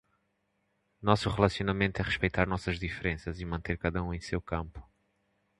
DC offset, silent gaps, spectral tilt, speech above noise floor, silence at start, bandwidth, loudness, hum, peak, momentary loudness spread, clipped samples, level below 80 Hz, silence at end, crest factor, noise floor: under 0.1%; none; -6.5 dB/octave; 46 dB; 1 s; 11.5 kHz; -31 LUFS; none; -6 dBFS; 9 LU; under 0.1%; -46 dBFS; 0.75 s; 26 dB; -77 dBFS